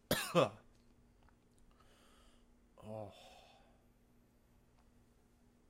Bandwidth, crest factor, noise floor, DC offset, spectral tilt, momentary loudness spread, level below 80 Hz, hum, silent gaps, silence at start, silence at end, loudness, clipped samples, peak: 16 kHz; 28 dB; -70 dBFS; under 0.1%; -4.5 dB/octave; 27 LU; -68 dBFS; none; none; 0.1 s; 2.35 s; -38 LUFS; under 0.1%; -16 dBFS